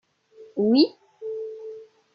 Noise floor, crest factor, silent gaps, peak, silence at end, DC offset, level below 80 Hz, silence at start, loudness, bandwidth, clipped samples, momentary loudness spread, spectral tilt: -51 dBFS; 18 dB; none; -8 dBFS; 0.3 s; under 0.1%; -78 dBFS; 0.4 s; -24 LUFS; 5.4 kHz; under 0.1%; 20 LU; -8 dB/octave